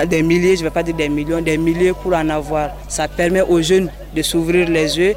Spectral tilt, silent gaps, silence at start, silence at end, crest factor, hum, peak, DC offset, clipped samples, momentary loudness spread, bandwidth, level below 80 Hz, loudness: -5 dB/octave; none; 0 s; 0 s; 10 dB; none; -6 dBFS; under 0.1%; under 0.1%; 7 LU; 16 kHz; -34 dBFS; -17 LUFS